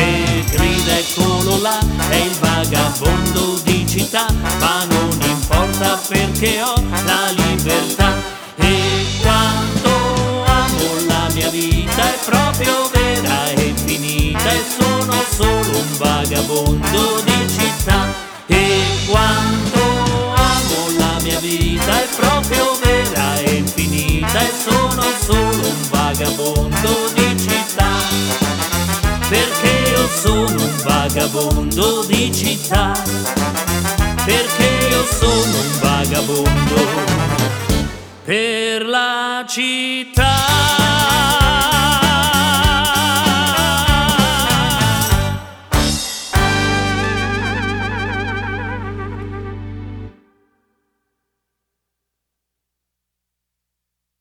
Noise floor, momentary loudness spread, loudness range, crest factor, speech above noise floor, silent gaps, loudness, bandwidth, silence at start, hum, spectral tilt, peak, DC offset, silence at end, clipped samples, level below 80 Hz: -79 dBFS; 5 LU; 4 LU; 16 dB; 64 dB; none; -15 LUFS; over 20 kHz; 0 s; 60 Hz at -40 dBFS; -4 dB/octave; 0 dBFS; under 0.1%; 4.1 s; under 0.1%; -26 dBFS